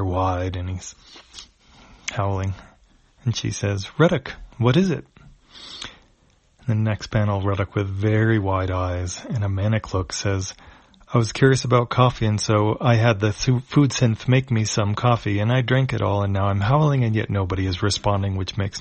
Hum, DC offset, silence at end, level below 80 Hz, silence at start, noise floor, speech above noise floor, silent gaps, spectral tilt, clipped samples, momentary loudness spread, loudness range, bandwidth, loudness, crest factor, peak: none; under 0.1%; 0 s; -44 dBFS; 0 s; -59 dBFS; 38 dB; none; -6 dB/octave; under 0.1%; 13 LU; 6 LU; 8.4 kHz; -21 LUFS; 20 dB; 0 dBFS